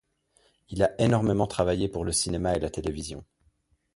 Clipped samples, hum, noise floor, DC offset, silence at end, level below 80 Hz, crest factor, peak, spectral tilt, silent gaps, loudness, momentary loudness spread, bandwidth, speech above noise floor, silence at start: under 0.1%; none; -68 dBFS; under 0.1%; 0.7 s; -44 dBFS; 20 dB; -8 dBFS; -5 dB/octave; none; -27 LUFS; 14 LU; 11.5 kHz; 42 dB; 0.7 s